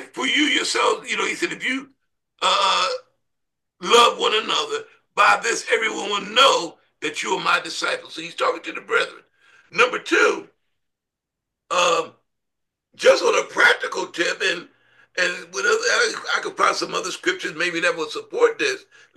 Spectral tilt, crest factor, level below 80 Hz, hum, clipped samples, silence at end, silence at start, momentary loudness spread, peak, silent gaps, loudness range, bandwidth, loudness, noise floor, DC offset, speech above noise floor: -1 dB/octave; 20 dB; -74 dBFS; none; under 0.1%; 0.35 s; 0 s; 12 LU; -2 dBFS; none; 4 LU; 12.5 kHz; -20 LUFS; -84 dBFS; under 0.1%; 63 dB